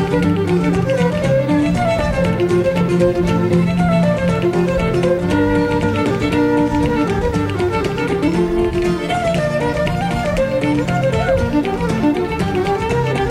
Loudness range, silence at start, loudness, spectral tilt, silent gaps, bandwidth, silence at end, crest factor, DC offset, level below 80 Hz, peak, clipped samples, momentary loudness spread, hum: 2 LU; 0 s; -17 LUFS; -7 dB/octave; none; 13 kHz; 0 s; 12 dB; under 0.1%; -32 dBFS; -2 dBFS; under 0.1%; 3 LU; none